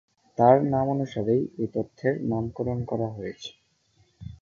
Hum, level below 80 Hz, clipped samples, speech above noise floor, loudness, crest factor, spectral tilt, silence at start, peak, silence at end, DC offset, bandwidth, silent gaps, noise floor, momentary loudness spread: none; -54 dBFS; under 0.1%; 40 dB; -25 LUFS; 22 dB; -8.5 dB/octave; 0.4 s; -4 dBFS; 0.05 s; under 0.1%; 7.2 kHz; none; -65 dBFS; 20 LU